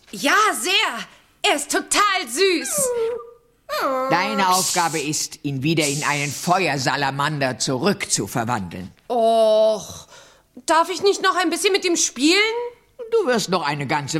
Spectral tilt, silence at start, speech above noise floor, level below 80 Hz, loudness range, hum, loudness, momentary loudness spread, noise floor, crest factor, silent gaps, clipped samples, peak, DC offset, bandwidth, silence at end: -3 dB/octave; 0.15 s; 28 dB; -60 dBFS; 2 LU; none; -19 LUFS; 10 LU; -48 dBFS; 18 dB; none; under 0.1%; -4 dBFS; under 0.1%; 16.5 kHz; 0 s